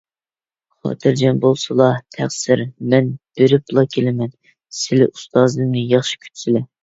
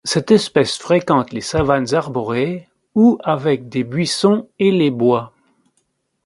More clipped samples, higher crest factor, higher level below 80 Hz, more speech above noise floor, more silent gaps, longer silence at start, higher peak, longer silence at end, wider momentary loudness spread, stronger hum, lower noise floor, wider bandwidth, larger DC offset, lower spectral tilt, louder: neither; about the same, 18 dB vs 16 dB; second, -58 dBFS vs -46 dBFS; first, over 74 dB vs 51 dB; neither; first, 0.85 s vs 0.05 s; about the same, 0 dBFS vs 0 dBFS; second, 0.2 s vs 1 s; first, 10 LU vs 7 LU; neither; first, under -90 dBFS vs -67 dBFS; second, 8 kHz vs 11.5 kHz; neither; about the same, -6 dB/octave vs -5.5 dB/octave; about the same, -17 LUFS vs -17 LUFS